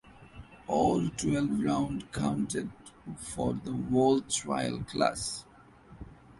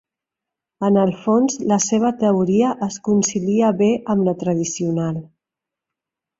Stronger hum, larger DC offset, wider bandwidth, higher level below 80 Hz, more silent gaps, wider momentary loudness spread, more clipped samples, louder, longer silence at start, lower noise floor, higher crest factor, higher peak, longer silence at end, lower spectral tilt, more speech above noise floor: neither; neither; first, 11.5 kHz vs 7.8 kHz; about the same, -54 dBFS vs -58 dBFS; neither; first, 21 LU vs 6 LU; neither; second, -30 LUFS vs -19 LUFS; second, 0.05 s vs 0.8 s; second, -54 dBFS vs -86 dBFS; about the same, 20 dB vs 16 dB; second, -12 dBFS vs -4 dBFS; second, 0.05 s vs 1.15 s; about the same, -5 dB/octave vs -6 dB/octave; second, 25 dB vs 68 dB